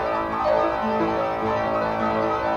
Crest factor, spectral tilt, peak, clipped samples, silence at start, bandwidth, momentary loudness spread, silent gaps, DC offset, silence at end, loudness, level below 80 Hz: 14 dB; -7 dB/octave; -8 dBFS; under 0.1%; 0 s; 8 kHz; 3 LU; none; under 0.1%; 0 s; -23 LUFS; -46 dBFS